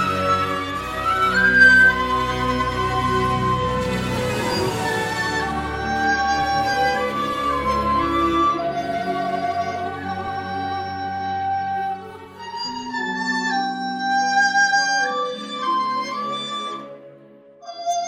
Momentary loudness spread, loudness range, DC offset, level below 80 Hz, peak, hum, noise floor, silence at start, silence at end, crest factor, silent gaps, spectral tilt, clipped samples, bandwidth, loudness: 11 LU; 9 LU; under 0.1%; -42 dBFS; -4 dBFS; none; -47 dBFS; 0 s; 0 s; 18 dB; none; -4 dB/octave; under 0.1%; 16.5 kHz; -20 LUFS